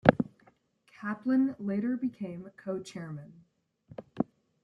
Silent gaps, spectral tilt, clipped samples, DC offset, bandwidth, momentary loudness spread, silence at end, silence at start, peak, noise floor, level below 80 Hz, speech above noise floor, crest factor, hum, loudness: none; -8 dB/octave; under 0.1%; under 0.1%; 9.4 kHz; 19 LU; 0.4 s; 0.05 s; -2 dBFS; -65 dBFS; -66 dBFS; 33 dB; 30 dB; none; -33 LUFS